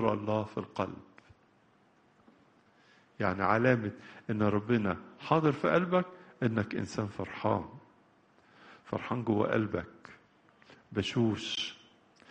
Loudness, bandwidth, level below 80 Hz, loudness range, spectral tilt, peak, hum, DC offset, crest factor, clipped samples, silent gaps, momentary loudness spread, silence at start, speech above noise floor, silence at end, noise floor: -32 LUFS; 9.2 kHz; -66 dBFS; 6 LU; -6.5 dB/octave; -10 dBFS; none; under 0.1%; 22 dB; under 0.1%; none; 12 LU; 0 s; 35 dB; 0.55 s; -66 dBFS